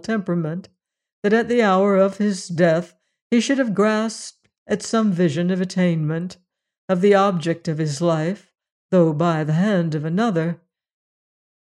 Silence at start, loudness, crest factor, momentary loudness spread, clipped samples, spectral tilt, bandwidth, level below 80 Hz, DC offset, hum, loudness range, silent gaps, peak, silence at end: 0.05 s; -20 LUFS; 16 dB; 11 LU; under 0.1%; -6.5 dB/octave; 11 kHz; -68 dBFS; under 0.1%; none; 2 LU; 1.13-1.22 s, 3.22-3.30 s, 4.58-4.66 s, 6.78-6.88 s, 8.72-8.89 s; -4 dBFS; 1.1 s